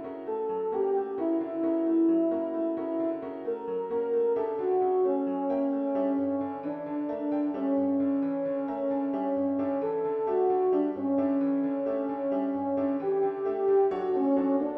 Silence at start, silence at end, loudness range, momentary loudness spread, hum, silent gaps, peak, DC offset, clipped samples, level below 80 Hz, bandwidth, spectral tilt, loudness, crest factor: 0 s; 0 s; 1 LU; 7 LU; none; none; -16 dBFS; under 0.1%; under 0.1%; -72 dBFS; 3.6 kHz; -10 dB/octave; -28 LUFS; 12 dB